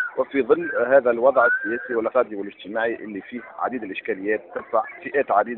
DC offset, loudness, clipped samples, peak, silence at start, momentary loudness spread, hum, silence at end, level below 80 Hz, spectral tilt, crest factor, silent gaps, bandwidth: under 0.1%; -22 LUFS; under 0.1%; -4 dBFS; 0 s; 12 LU; none; 0 s; -66 dBFS; -3 dB/octave; 18 dB; none; 4.1 kHz